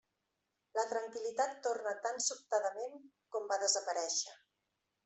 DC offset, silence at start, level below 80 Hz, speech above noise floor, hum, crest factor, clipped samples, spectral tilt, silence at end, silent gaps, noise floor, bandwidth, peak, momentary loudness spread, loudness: under 0.1%; 0.75 s; under -90 dBFS; 48 dB; none; 20 dB; under 0.1%; 1 dB/octave; 0.7 s; none; -86 dBFS; 8.2 kHz; -18 dBFS; 11 LU; -37 LUFS